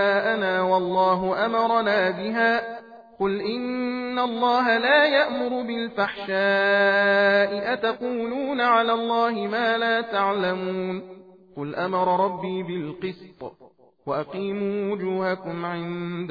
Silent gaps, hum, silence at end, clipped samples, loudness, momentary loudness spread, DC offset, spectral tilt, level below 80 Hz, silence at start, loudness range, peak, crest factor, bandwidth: none; none; 0 s; under 0.1%; -23 LUFS; 12 LU; under 0.1%; -7 dB/octave; -64 dBFS; 0 s; 8 LU; -8 dBFS; 16 dB; 5 kHz